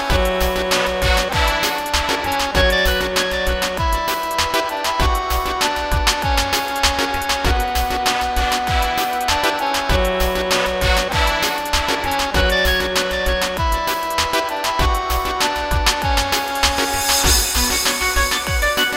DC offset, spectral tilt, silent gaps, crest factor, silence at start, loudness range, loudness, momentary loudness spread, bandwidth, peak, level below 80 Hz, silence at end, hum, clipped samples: under 0.1%; -2.5 dB/octave; none; 18 dB; 0 s; 2 LU; -18 LUFS; 4 LU; 16.5 kHz; 0 dBFS; -26 dBFS; 0 s; none; under 0.1%